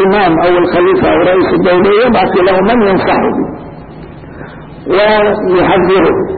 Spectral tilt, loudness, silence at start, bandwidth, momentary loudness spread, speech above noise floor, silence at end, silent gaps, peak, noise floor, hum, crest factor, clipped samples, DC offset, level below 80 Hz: -12 dB/octave; -9 LUFS; 0 s; 4.7 kHz; 21 LU; 20 dB; 0 s; none; -2 dBFS; -29 dBFS; none; 8 dB; under 0.1%; under 0.1%; -34 dBFS